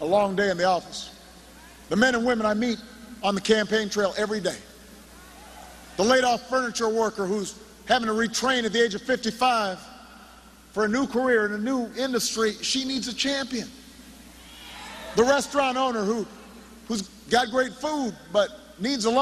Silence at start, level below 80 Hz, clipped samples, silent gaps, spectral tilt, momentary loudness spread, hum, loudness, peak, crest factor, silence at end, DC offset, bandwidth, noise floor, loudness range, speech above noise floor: 0 s; -56 dBFS; under 0.1%; none; -3.5 dB/octave; 18 LU; none; -25 LUFS; -4 dBFS; 22 dB; 0 s; under 0.1%; 13.5 kHz; -50 dBFS; 3 LU; 25 dB